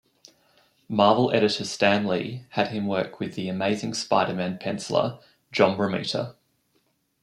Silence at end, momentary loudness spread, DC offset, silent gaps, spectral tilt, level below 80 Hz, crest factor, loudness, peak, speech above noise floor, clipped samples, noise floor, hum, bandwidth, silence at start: 0.9 s; 10 LU; under 0.1%; none; -5 dB/octave; -68 dBFS; 22 dB; -25 LUFS; -4 dBFS; 45 dB; under 0.1%; -70 dBFS; none; 12 kHz; 0.9 s